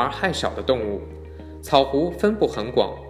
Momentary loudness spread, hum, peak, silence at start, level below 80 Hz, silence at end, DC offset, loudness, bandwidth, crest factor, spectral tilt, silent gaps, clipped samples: 18 LU; none; -2 dBFS; 0 s; -42 dBFS; 0 s; under 0.1%; -22 LUFS; 15.5 kHz; 22 dB; -5.5 dB/octave; none; under 0.1%